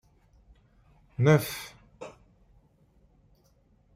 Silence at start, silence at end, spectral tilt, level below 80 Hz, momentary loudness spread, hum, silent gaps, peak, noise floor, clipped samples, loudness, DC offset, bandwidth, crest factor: 1.2 s; 1.85 s; -6.5 dB/octave; -62 dBFS; 24 LU; none; none; -10 dBFS; -64 dBFS; under 0.1%; -26 LUFS; under 0.1%; 16 kHz; 22 dB